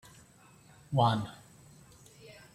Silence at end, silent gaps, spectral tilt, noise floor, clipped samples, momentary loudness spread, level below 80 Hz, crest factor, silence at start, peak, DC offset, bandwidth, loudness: 0.3 s; none; -6.5 dB/octave; -59 dBFS; under 0.1%; 26 LU; -66 dBFS; 22 dB; 0.9 s; -14 dBFS; under 0.1%; 14 kHz; -31 LUFS